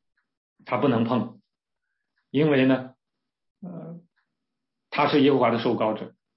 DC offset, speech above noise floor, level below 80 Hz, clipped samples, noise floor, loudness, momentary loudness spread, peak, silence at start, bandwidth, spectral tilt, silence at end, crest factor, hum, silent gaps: under 0.1%; 64 dB; -74 dBFS; under 0.1%; -85 dBFS; -23 LUFS; 21 LU; -8 dBFS; 0.65 s; 5.8 kHz; -10.5 dB/octave; 0.3 s; 18 dB; none; 3.50-3.55 s